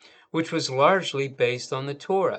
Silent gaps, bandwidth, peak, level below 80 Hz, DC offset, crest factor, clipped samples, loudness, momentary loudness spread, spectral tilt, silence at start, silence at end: none; 9 kHz; -4 dBFS; -78 dBFS; under 0.1%; 20 dB; under 0.1%; -25 LUFS; 11 LU; -4.5 dB/octave; 0.35 s; 0 s